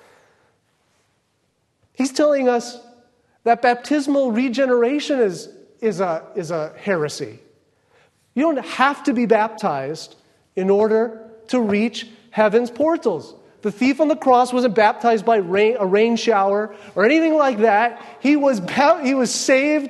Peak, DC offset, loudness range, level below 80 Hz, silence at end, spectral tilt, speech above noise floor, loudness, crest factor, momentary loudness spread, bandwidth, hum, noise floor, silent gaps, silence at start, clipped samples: 0 dBFS; under 0.1%; 6 LU; -70 dBFS; 0 s; -4.5 dB/octave; 49 dB; -19 LUFS; 18 dB; 11 LU; 12.5 kHz; none; -67 dBFS; none; 2 s; under 0.1%